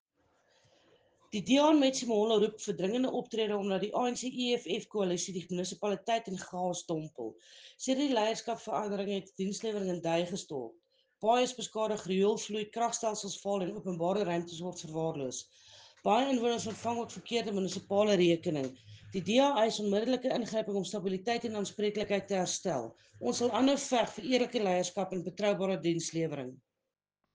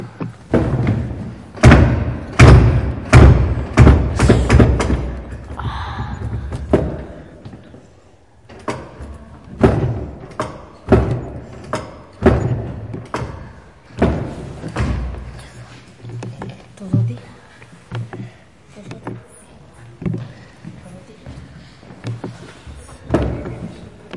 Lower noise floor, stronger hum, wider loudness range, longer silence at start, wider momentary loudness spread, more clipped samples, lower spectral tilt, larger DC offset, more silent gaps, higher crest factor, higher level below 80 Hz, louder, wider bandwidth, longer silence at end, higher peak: first, -89 dBFS vs -48 dBFS; neither; second, 4 LU vs 20 LU; first, 1.3 s vs 0 s; second, 10 LU vs 26 LU; neither; second, -4.5 dB/octave vs -7.5 dB/octave; second, under 0.1% vs 0.2%; neither; about the same, 18 dB vs 18 dB; second, -74 dBFS vs -24 dBFS; second, -32 LUFS vs -16 LUFS; second, 10 kHz vs 11.5 kHz; first, 0.8 s vs 0 s; second, -14 dBFS vs 0 dBFS